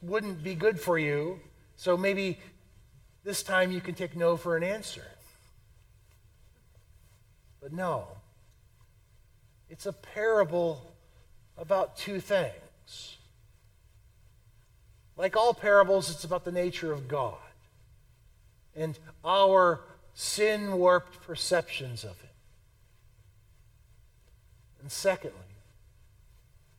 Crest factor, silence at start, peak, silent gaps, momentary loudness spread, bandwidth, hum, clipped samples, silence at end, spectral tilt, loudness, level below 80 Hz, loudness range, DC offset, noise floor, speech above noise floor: 24 dB; 0 s; -8 dBFS; none; 21 LU; 17 kHz; none; under 0.1%; 1.25 s; -4 dB/octave; -29 LUFS; -60 dBFS; 15 LU; under 0.1%; -61 dBFS; 32 dB